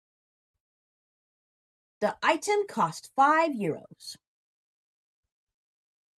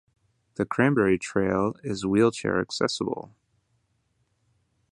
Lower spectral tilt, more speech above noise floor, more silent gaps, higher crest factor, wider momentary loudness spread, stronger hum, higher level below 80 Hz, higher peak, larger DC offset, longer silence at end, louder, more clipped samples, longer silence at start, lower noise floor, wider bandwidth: second, -4 dB/octave vs -5.5 dB/octave; first, over 63 dB vs 47 dB; neither; about the same, 22 dB vs 22 dB; first, 20 LU vs 10 LU; neither; second, -78 dBFS vs -56 dBFS; second, -10 dBFS vs -6 dBFS; neither; first, 2.05 s vs 1.7 s; about the same, -26 LUFS vs -25 LUFS; neither; first, 2 s vs 0.6 s; first, under -90 dBFS vs -72 dBFS; first, 14 kHz vs 11 kHz